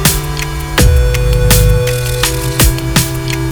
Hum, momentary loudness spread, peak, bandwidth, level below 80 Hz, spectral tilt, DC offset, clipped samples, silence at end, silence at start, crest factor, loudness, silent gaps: none; 7 LU; 0 dBFS; over 20 kHz; -14 dBFS; -4 dB/octave; 1%; 0.6%; 0 s; 0 s; 12 dB; -12 LUFS; none